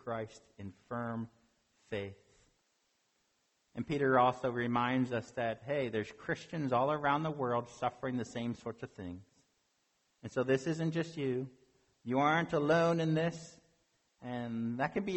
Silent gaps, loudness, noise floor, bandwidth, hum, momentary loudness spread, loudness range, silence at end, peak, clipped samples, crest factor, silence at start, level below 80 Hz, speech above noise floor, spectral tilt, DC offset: none; -34 LUFS; -78 dBFS; 8.4 kHz; none; 18 LU; 7 LU; 0 s; -14 dBFS; under 0.1%; 20 dB; 0.05 s; -70 dBFS; 43 dB; -6.5 dB/octave; under 0.1%